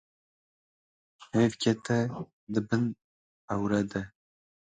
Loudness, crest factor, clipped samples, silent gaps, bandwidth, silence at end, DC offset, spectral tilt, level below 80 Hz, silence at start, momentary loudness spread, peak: -30 LUFS; 20 dB; under 0.1%; 2.33-2.47 s, 3.04-3.48 s; 9.4 kHz; 0.7 s; under 0.1%; -6.5 dB/octave; -62 dBFS; 1.2 s; 12 LU; -12 dBFS